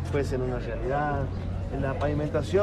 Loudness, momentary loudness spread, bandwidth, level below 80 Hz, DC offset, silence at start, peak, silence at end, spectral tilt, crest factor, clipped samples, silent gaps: -29 LUFS; 5 LU; 11.5 kHz; -38 dBFS; under 0.1%; 0 s; -12 dBFS; 0 s; -7.5 dB/octave; 16 dB; under 0.1%; none